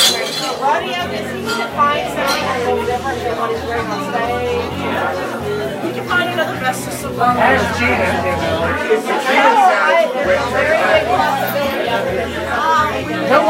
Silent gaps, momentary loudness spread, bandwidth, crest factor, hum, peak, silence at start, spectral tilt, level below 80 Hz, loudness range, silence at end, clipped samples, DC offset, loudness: none; 8 LU; 16 kHz; 16 dB; none; 0 dBFS; 0 s; -3.5 dB/octave; -42 dBFS; 5 LU; 0 s; under 0.1%; under 0.1%; -16 LUFS